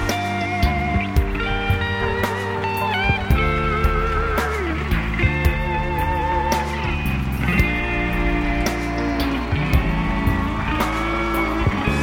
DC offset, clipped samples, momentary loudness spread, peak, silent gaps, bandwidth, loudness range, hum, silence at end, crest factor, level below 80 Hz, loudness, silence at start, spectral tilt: under 0.1%; under 0.1%; 3 LU; -4 dBFS; none; 17 kHz; 1 LU; none; 0 s; 16 dB; -26 dBFS; -21 LUFS; 0 s; -6 dB/octave